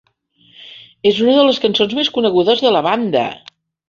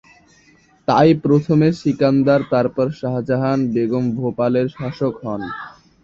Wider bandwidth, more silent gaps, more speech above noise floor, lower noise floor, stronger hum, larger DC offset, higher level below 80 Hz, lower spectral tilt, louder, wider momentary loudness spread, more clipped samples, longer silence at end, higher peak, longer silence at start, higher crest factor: about the same, 7.4 kHz vs 7.6 kHz; neither; first, 40 dB vs 36 dB; about the same, -54 dBFS vs -53 dBFS; neither; neither; second, -58 dBFS vs -52 dBFS; second, -5.5 dB/octave vs -8.5 dB/octave; first, -14 LUFS vs -18 LUFS; second, 9 LU vs 12 LU; neither; first, 0.5 s vs 0.35 s; about the same, 0 dBFS vs -2 dBFS; second, 0.6 s vs 0.9 s; about the same, 16 dB vs 16 dB